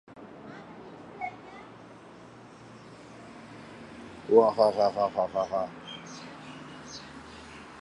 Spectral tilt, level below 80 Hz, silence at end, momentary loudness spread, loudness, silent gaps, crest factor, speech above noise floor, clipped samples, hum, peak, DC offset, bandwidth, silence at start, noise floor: -5.5 dB/octave; -66 dBFS; 0 s; 25 LU; -27 LUFS; none; 24 dB; 25 dB; under 0.1%; none; -8 dBFS; under 0.1%; 11 kHz; 0.1 s; -49 dBFS